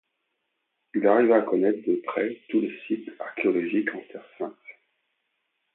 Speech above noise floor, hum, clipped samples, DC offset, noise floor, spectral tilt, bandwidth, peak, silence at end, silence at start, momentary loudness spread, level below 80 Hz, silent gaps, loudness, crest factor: 53 dB; none; under 0.1%; under 0.1%; -78 dBFS; -10.5 dB/octave; 4 kHz; -8 dBFS; 1.05 s; 0.95 s; 16 LU; -80 dBFS; none; -25 LUFS; 20 dB